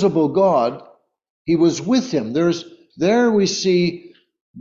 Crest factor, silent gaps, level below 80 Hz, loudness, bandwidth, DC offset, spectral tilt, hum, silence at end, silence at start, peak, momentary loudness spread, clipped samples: 14 dB; 1.30-1.45 s, 4.41-4.54 s; -58 dBFS; -18 LUFS; 7.6 kHz; under 0.1%; -5.5 dB/octave; none; 0 s; 0 s; -6 dBFS; 10 LU; under 0.1%